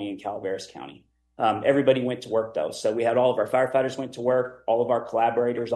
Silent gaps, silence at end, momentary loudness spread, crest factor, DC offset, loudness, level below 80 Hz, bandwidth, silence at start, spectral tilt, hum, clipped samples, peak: none; 0 s; 10 LU; 18 dB; under 0.1%; -24 LUFS; -66 dBFS; 12 kHz; 0 s; -5.5 dB/octave; none; under 0.1%; -8 dBFS